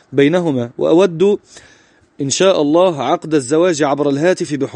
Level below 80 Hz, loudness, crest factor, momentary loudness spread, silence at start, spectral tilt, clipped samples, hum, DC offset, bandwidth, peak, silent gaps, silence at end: -60 dBFS; -14 LUFS; 14 dB; 6 LU; 0.1 s; -5 dB/octave; under 0.1%; none; under 0.1%; 10 kHz; 0 dBFS; none; 0 s